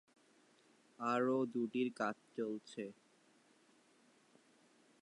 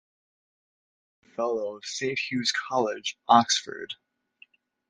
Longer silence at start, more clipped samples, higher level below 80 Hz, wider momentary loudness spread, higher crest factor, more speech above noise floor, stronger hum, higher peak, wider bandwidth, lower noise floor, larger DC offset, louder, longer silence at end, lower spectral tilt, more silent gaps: second, 1 s vs 1.4 s; neither; second, under -90 dBFS vs -74 dBFS; second, 13 LU vs 18 LU; second, 20 dB vs 26 dB; about the same, 32 dB vs 33 dB; neither; second, -24 dBFS vs -4 dBFS; about the same, 11 kHz vs 10.5 kHz; first, -71 dBFS vs -59 dBFS; neither; second, -40 LUFS vs -26 LUFS; first, 2.1 s vs 0.95 s; first, -6 dB/octave vs -2.5 dB/octave; neither